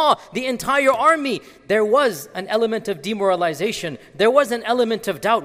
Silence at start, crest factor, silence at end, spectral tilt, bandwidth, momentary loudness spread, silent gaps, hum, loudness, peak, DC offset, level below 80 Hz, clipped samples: 0 s; 18 dB; 0 s; -4 dB/octave; 16 kHz; 9 LU; none; none; -19 LUFS; -2 dBFS; under 0.1%; -58 dBFS; under 0.1%